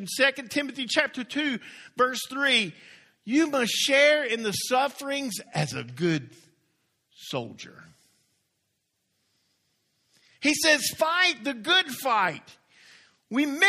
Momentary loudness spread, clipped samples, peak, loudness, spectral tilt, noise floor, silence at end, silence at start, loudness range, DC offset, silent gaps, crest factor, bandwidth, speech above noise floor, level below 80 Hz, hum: 13 LU; under 0.1%; -6 dBFS; -25 LUFS; -3 dB/octave; -77 dBFS; 0 s; 0 s; 18 LU; under 0.1%; none; 22 dB; 15.5 kHz; 51 dB; -72 dBFS; none